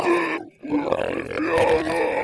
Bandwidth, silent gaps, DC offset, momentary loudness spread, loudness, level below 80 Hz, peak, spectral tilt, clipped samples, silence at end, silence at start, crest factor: 11 kHz; none; under 0.1%; 7 LU; -23 LUFS; -48 dBFS; -4 dBFS; -5.5 dB/octave; under 0.1%; 0 s; 0 s; 18 dB